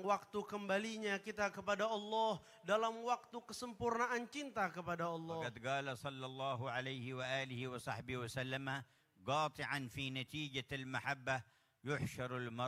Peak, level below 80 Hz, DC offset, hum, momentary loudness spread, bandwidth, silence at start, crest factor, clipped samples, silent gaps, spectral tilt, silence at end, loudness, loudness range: -22 dBFS; -74 dBFS; under 0.1%; none; 7 LU; 16 kHz; 0 s; 20 dB; under 0.1%; none; -4.5 dB/octave; 0 s; -42 LUFS; 3 LU